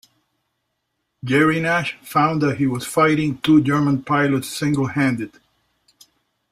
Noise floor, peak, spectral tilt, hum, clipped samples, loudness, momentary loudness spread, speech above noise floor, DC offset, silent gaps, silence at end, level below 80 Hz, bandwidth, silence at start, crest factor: -75 dBFS; -4 dBFS; -6 dB/octave; none; under 0.1%; -19 LUFS; 6 LU; 56 dB; under 0.1%; none; 1.25 s; -56 dBFS; 15.5 kHz; 1.25 s; 16 dB